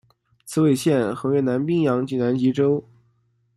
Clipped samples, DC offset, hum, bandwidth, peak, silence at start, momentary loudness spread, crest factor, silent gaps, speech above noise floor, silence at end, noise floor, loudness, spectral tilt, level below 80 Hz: under 0.1%; under 0.1%; none; 14.5 kHz; -8 dBFS; 0.45 s; 3 LU; 14 dB; none; 45 dB; 0.75 s; -65 dBFS; -21 LUFS; -7 dB/octave; -62 dBFS